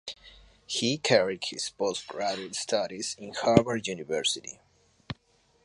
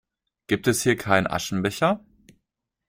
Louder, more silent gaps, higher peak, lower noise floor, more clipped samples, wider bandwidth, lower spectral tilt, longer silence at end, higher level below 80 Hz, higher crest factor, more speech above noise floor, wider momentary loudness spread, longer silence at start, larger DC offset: second, -28 LUFS vs -23 LUFS; neither; about the same, -2 dBFS vs -2 dBFS; second, -66 dBFS vs -82 dBFS; neither; second, 11.5 kHz vs 16.5 kHz; about the same, -3.5 dB/octave vs -4.5 dB/octave; second, 0.5 s vs 0.9 s; about the same, -58 dBFS vs -56 dBFS; first, 28 dB vs 22 dB; second, 38 dB vs 59 dB; first, 19 LU vs 6 LU; second, 0.05 s vs 0.5 s; neither